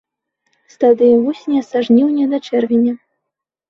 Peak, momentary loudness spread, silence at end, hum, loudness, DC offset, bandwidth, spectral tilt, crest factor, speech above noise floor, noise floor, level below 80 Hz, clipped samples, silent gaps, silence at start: -2 dBFS; 7 LU; 0.75 s; none; -14 LUFS; under 0.1%; 6.8 kHz; -7 dB/octave; 14 dB; 66 dB; -80 dBFS; -64 dBFS; under 0.1%; none; 0.8 s